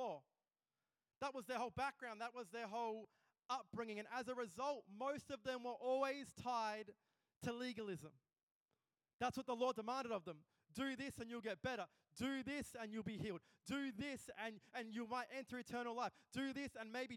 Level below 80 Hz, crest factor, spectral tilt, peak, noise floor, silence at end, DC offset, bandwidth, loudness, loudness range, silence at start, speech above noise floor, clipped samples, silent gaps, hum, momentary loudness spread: -80 dBFS; 20 dB; -4.5 dB/octave; -28 dBFS; under -90 dBFS; 0 s; under 0.1%; 18 kHz; -47 LUFS; 3 LU; 0 s; over 43 dB; under 0.1%; 7.36-7.41 s, 8.43-8.66 s, 9.13-9.19 s; none; 8 LU